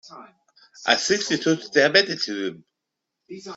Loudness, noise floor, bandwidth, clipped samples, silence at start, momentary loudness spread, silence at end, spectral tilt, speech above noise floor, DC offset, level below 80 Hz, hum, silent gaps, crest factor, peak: -21 LUFS; -82 dBFS; 8 kHz; under 0.1%; 0.05 s; 15 LU; 0 s; -2.5 dB/octave; 60 dB; under 0.1%; -70 dBFS; none; none; 22 dB; -2 dBFS